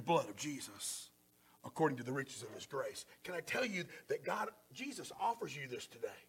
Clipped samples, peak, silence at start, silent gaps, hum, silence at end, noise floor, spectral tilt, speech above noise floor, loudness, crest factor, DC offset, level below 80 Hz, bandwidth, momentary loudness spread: under 0.1%; -22 dBFS; 0 s; none; none; 0.05 s; -70 dBFS; -4 dB/octave; 28 dB; -42 LUFS; 20 dB; under 0.1%; -82 dBFS; 17.5 kHz; 11 LU